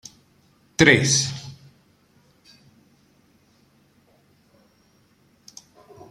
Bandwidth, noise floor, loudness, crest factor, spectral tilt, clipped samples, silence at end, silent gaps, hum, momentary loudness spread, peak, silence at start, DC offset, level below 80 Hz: 14.5 kHz; -60 dBFS; -18 LUFS; 28 dB; -3.5 dB/octave; under 0.1%; 4.6 s; none; none; 31 LU; 0 dBFS; 0.8 s; under 0.1%; -56 dBFS